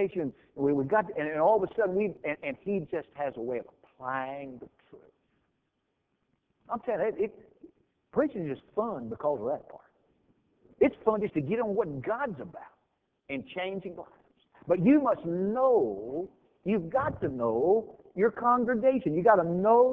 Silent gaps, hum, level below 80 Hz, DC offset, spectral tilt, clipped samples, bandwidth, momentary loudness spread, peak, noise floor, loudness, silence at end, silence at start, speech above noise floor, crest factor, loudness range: none; none; -64 dBFS; under 0.1%; -10 dB/octave; under 0.1%; 3.9 kHz; 14 LU; -8 dBFS; -79 dBFS; -29 LUFS; 0 s; 0 s; 51 dB; 22 dB; 10 LU